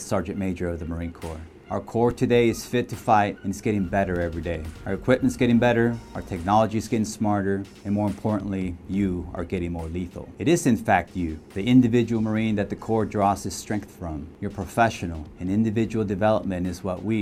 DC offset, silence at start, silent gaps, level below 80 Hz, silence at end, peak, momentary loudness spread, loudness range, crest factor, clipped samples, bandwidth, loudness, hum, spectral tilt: under 0.1%; 0 s; none; -46 dBFS; 0 s; -4 dBFS; 12 LU; 3 LU; 20 dB; under 0.1%; 15.5 kHz; -25 LUFS; none; -6.5 dB/octave